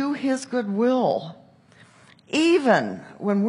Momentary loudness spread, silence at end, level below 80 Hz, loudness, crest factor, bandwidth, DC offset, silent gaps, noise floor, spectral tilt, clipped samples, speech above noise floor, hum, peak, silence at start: 11 LU; 0 s; -76 dBFS; -22 LUFS; 18 dB; 11.5 kHz; under 0.1%; none; -53 dBFS; -5.5 dB/octave; under 0.1%; 31 dB; none; -4 dBFS; 0 s